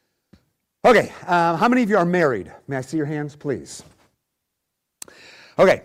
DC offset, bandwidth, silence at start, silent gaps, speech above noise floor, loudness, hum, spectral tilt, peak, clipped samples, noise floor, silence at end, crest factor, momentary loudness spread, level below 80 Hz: under 0.1%; 16 kHz; 0.85 s; none; 60 dB; -20 LUFS; none; -6 dB/octave; -6 dBFS; under 0.1%; -79 dBFS; 0.05 s; 16 dB; 23 LU; -56 dBFS